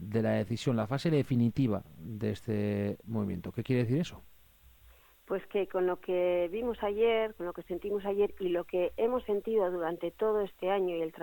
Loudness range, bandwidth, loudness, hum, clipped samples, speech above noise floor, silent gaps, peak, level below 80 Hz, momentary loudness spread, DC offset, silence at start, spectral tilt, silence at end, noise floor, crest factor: 3 LU; 17.5 kHz; -32 LUFS; none; under 0.1%; 28 dB; none; -18 dBFS; -60 dBFS; 7 LU; under 0.1%; 0 s; -7.5 dB/octave; 0 s; -60 dBFS; 14 dB